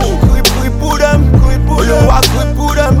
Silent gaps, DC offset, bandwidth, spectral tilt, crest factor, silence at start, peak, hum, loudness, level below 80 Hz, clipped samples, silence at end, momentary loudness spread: none; 0.9%; 16.5 kHz; -5 dB/octave; 8 dB; 0 s; 0 dBFS; none; -10 LUFS; -12 dBFS; 0.3%; 0 s; 5 LU